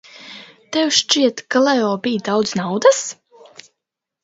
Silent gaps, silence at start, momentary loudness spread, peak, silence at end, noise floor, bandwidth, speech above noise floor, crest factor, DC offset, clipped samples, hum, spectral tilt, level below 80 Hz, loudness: none; 0.15 s; 21 LU; 0 dBFS; 1.1 s; -82 dBFS; 8 kHz; 65 dB; 18 dB; under 0.1%; under 0.1%; none; -3 dB/octave; -66 dBFS; -17 LUFS